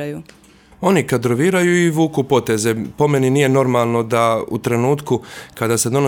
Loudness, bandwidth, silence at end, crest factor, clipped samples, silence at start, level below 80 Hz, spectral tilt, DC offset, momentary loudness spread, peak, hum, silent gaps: -17 LUFS; 19 kHz; 0 s; 16 dB; under 0.1%; 0 s; -54 dBFS; -5.5 dB/octave; under 0.1%; 8 LU; -2 dBFS; none; none